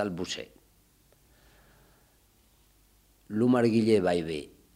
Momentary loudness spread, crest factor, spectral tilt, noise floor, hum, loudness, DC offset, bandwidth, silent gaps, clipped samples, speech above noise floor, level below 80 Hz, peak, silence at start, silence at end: 15 LU; 20 dB; -6 dB/octave; -64 dBFS; none; -27 LUFS; under 0.1%; 15.5 kHz; none; under 0.1%; 37 dB; -62 dBFS; -12 dBFS; 0 s; 0.3 s